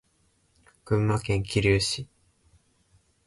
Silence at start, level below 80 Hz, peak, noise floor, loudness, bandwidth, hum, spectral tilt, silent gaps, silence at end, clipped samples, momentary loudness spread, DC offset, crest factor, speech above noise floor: 0.85 s; -46 dBFS; -10 dBFS; -68 dBFS; -26 LUFS; 11.5 kHz; none; -5 dB/octave; none; 1.2 s; under 0.1%; 9 LU; under 0.1%; 18 dB; 43 dB